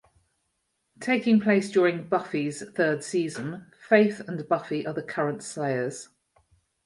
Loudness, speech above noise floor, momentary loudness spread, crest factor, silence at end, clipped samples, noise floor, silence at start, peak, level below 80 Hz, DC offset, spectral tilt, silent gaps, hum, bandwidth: -26 LUFS; 51 dB; 14 LU; 22 dB; 0.8 s; under 0.1%; -76 dBFS; 1 s; -6 dBFS; -72 dBFS; under 0.1%; -5.5 dB/octave; none; none; 11.5 kHz